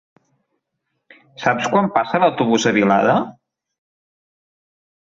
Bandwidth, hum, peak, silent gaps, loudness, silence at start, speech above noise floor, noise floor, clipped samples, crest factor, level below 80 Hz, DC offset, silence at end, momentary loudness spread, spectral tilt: 7.6 kHz; none; -2 dBFS; none; -17 LUFS; 1.4 s; 58 dB; -75 dBFS; under 0.1%; 18 dB; -60 dBFS; under 0.1%; 1.75 s; 6 LU; -5 dB/octave